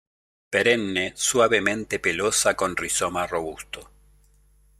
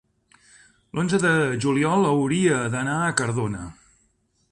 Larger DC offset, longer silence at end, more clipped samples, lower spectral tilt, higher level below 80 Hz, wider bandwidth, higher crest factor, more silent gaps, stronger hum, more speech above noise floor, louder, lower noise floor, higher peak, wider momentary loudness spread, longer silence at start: neither; first, 0.95 s vs 0.8 s; neither; second, -2 dB/octave vs -5.5 dB/octave; about the same, -54 dBFS vs -54 dBFS; first, 16 kHz vs 11.5 kHz; about the same, 20 dB vs 20 dB; neither; first, 50 Hz at -50 dBFS vs none; second, 35 dB vs 45 dB; about the same, -23 LUFS vs -22 LUFS; second, -58 dBFS vs -67 dBFS; about the same, -4 dBFS vs -4 dBFS; about the same, 12 LU vs 10 LU; second, 0.5 s vs 0.95 s